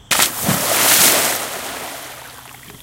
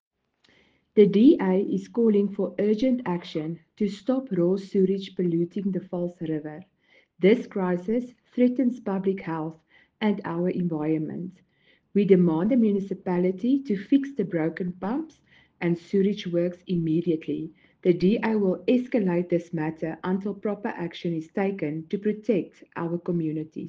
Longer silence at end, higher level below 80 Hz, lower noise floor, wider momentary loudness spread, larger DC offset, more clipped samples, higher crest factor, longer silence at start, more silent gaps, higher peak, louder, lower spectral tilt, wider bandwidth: about the same, 0 s vs 0 s; first, -52 dBFS vs -66 dBFS; second, -38 dBFS vs -64 dBFS; first, 22 LU vs 10 LU; neither; neither; about the same, 18 dB vs 20 dB; second, 0.1 s vs 0.95 s; neither; first, 0 dBFS vs -6 dBFS; first, -13 LUFS vs -25 LUFS; second, -1 dB/octave vs -9 dB/octave; first, over 20 kHz vs 7.4 kHz